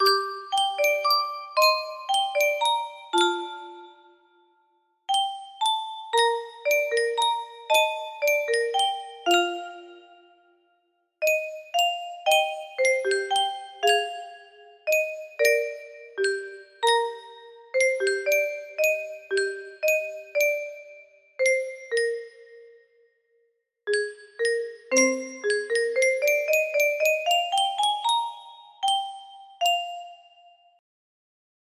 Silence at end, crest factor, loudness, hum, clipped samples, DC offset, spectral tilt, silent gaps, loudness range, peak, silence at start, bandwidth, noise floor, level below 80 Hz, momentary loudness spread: 1.6 s; 20 dB; -24 LUFS; none; under 0.1%; under 0.1%; 0.5 dB/octave; none; 5 LU; -6 dBFS; 0 s; 15.5 kHz; -71 dBFS; -78 dBFS; 13 LU